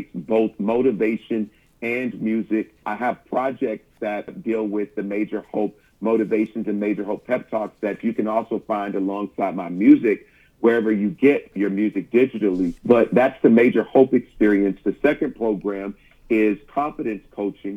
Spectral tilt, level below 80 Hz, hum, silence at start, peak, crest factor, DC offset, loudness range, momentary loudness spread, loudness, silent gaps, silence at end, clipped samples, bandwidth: -8.5 dB/octave; -54 dBFS; none; 0 s; -2 dBFS; 18 dB; under 0.1%; 7 LU; 11 LU; -21 LUFS; none; 0 s; under 0.1%; 5.8 kHz